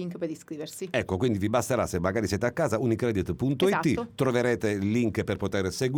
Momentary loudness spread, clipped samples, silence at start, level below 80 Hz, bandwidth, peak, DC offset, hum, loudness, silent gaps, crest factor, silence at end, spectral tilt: 7 LU; under 0.1%; 0 s; -52 dBFS; over 20 kHz; -10 dBFS; under 0.1%; none; -27 LUFS; none; 16 dB; 0 s; -6 dB/octave